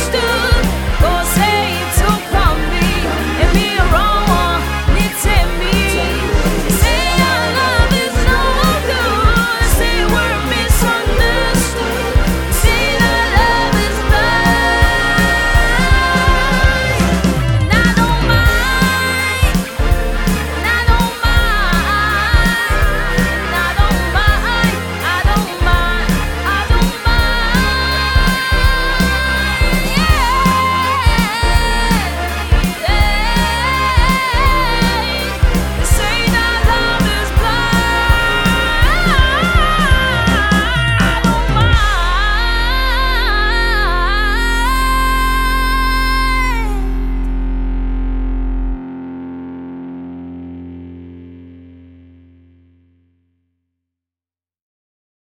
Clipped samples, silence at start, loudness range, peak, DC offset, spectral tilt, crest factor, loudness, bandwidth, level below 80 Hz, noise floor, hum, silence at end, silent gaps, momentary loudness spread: under 0.1%; 0 s; 4 LU; 0 dBFS; under 0.1%; -4.5 dB/octave; 14 dB; -14 LUFS; 19 kHz; -18 dBFS; under -90 dBFS; none; 3.6 s; none; 5 LU